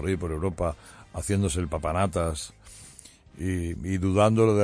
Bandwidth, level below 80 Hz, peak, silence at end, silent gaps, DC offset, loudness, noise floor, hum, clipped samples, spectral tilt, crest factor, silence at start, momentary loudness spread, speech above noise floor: 11 kHz; -42 dBFS; -8 dBFS; 0 s; none; under 0.1%; -27 LUFS; -50 dBFS; none; under 0.1%; -6 dB/octave; 18 dB; 0 s; 21 LU; 24 dB